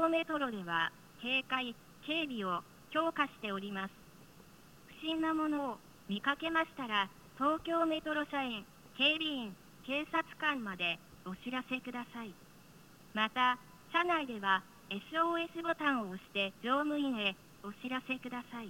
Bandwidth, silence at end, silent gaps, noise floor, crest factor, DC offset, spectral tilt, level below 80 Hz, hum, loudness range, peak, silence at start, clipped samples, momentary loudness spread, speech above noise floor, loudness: 17 kHz; 0 s; none; -59 dBFS; 20 dB; under 0.1%; -4.5 dB/octave; -70 dBFS; none; 4 LU; -16 dBFS; 0 s; under 0.1%; 12 LU; 23 dB; -35 LUFS